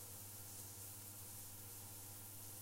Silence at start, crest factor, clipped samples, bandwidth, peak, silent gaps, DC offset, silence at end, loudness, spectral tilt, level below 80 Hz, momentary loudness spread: 0 s; 16 dB; under 0.1%; 16 kHz; -38 dBFS; none; under 0.1%; 0 s; -51 LUFS; -2.5 dB/octave; -72 dBFS; 1 LU